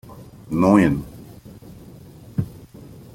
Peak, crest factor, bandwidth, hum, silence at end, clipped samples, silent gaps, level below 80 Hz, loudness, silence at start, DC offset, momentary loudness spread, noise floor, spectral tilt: -2 dBFS; 20 dB; 16.5 kHz; none; 0.5 s; under 0.1%; none; -46 dBFS; -20 LUFS; 0.1 s; under 0.1%; 27 LU; -42 dBFS; -8 dB/octave